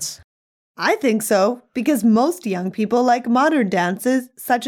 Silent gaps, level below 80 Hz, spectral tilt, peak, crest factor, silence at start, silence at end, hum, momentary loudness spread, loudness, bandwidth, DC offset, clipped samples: 0.24-0.74 s; -66 dBFS; -4.5 dB/octave; -4 dBFS; 14 dB; 0 s; 0 s; none; 7 LU; -19 LUFS; 18 kHz; under 0.1%; under 0.1%